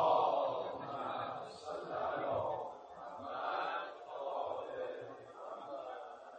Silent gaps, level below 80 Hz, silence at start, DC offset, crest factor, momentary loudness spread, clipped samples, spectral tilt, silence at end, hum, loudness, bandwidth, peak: none; -76 dBFS; 0 s; under 0.1%; 20 dB; 12 LU; under 0.1%; -5.5 dB/octave; 0 s; none; -40 LUFS; 9 kHz; -20 dBFS